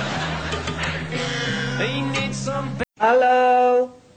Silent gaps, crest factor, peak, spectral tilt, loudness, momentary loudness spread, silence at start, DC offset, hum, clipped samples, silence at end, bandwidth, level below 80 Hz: none; 16 dB; -6 dBFS; -5 dB/octave; -21 LUFS; 10 LU; 0 s; 0.5%; none; under 0.1%; 0.2 s; 9.2 kHz; -44 dBFS